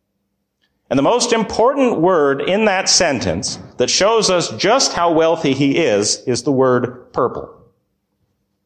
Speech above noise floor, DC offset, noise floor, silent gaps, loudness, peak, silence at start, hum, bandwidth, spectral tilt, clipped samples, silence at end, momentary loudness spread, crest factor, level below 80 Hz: 56 dB; under 0.1%; -71 dBFS; none; -15 LUFS; -2 dBFS; 0.9 s; none; 10.5 kHz; -3.5 dB/octave; under 0.1%; 1.15 s; 8 LU; 14 dB; -48 dBFS